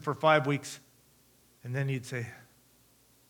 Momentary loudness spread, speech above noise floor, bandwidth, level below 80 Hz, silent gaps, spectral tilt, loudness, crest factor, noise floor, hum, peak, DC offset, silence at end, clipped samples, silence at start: 20 LU; 34 dB; 19.5 kHz; -76 dBFS; none; -5.5 dB/octave; -30 LUFS; 24 dB; -64 dBFS; 60 Hz at -55 dBFS; -10 dBFS; under 0.1%; 0.9 s; under 0.1%; 0 s